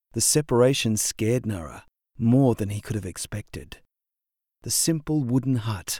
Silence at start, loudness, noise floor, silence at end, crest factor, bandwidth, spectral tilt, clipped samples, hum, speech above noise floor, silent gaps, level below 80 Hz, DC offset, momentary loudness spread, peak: 0.15 s; -23 LUFS; -87 dBFS; 0 s; 18 dB; 19.5 kHz; -4.5 dB/octave; under 0.1%; none; 64 dB; none; -50 dBFS; under 0.1%; 15 LU; -6 dBFS